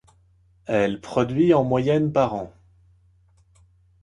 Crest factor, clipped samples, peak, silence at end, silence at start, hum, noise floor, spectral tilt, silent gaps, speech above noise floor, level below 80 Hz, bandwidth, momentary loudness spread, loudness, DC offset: 18 dB; under 0.1%; -6 dBFS; 1.55 s; 0.7 s; none; -59 dBFS; -7.5 dB/octave; none; 38 dB; -54 dBFS; 10.5 kHz; 14 LU; -22 LUFS; under 0.1%